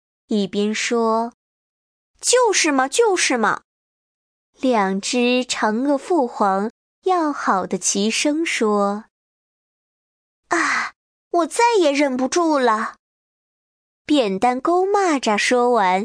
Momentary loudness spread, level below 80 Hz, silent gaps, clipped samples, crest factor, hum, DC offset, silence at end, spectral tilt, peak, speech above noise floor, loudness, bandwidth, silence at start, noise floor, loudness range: 7 LU; -66 dBFS; 1.34-2.14 s, 3.65-4.53 s, 6.70-7.02 s, 9.10-10.43 s, 10.96-11.31 s, 12.99-14.05 s; under 0.1%; 16 dB; none; under 0.1%; 0 s; -3 dB/octave; -4 dBFS; over 72 dB; -19 LUFS; 10.5 kHz; 0.3 s; under -90 dBFS; 3 LU